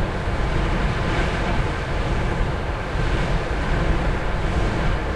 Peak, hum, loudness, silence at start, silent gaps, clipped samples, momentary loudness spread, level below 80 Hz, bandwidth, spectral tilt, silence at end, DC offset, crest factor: -8 dBFS; none; -24 LUFS; 0 s; none; under 0.1%; 3 LU; -24 dBFS; 10.5 kHz; -6.5 dB/octave; 0 s; under 0.1%; 14 dB